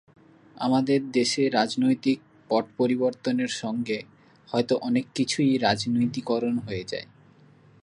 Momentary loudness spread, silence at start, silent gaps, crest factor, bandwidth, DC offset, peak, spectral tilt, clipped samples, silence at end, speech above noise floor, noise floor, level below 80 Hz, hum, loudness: 8 LU; 0.55 s; none; 20 dB; 11 kHz; under 0.1%; -6 dBFS; -5 dB/octave; under 0.1%; 0.8 s; 30 dB; -55 dBFS; -64 dBFS; none; -25 LUFS